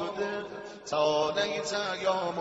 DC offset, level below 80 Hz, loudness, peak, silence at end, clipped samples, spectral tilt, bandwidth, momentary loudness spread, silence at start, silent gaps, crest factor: under 0.1%; -68 dBFS; -30 LUFS; -14 dBFS; 0 s; under 0.1%; -3 dB/octave; 8 kHz; 11 LU; 0 s; none; 16 dB